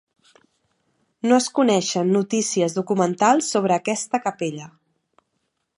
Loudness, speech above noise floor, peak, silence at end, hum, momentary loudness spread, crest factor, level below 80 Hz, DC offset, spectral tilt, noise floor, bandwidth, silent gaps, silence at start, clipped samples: -21 LUFS; 54 dB; -4 dBFS; 1.1 s; none; 9 LU; 18 dB; -74 dBFS; under 0.1%; -4.5 dB/octave; -74 dBFS; 11.5 kHz; none; 1.25 s; under 0.1%